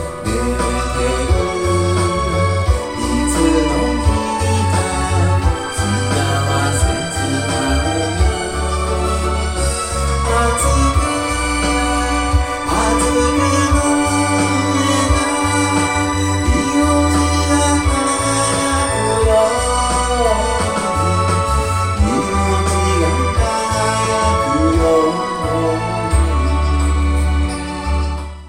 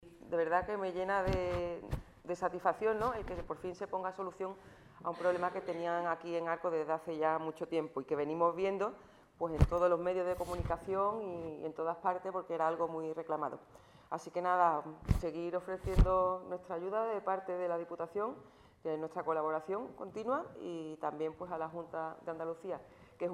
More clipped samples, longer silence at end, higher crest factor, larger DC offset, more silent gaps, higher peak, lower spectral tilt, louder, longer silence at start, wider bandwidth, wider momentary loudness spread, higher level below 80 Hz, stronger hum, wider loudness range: neither; about the same, 0 s vs 0 s; second, 12 dB vs 24 dB; neither; neither; first, -2 dBFS vs -12 dBFS; second, -5 dB/octave vs -7.5 dB/octave; first, -16 LUFS vs -37 LUFS; about the same, 0 s vs 0 s; about the same, 15.5 kHz vs 15 kHz; second, 4 LU vs 11 LU; first, -22 dBFS vs -46 dBFS; neither; second, 2 LU vs 5 LU